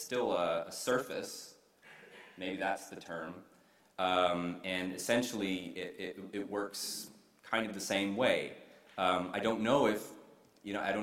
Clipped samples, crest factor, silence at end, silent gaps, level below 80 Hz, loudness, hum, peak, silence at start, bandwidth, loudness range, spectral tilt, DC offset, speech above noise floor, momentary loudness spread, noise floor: under 0.1%; 22 dB; 0 s; none; -72 dBFS; -35 LUFS; none; -14 dBFS; 0 s; 16 kHz; 5 LU; -3.5 dB/octave; under 0.1%; 24 dB; 18 LU; -59 dBFS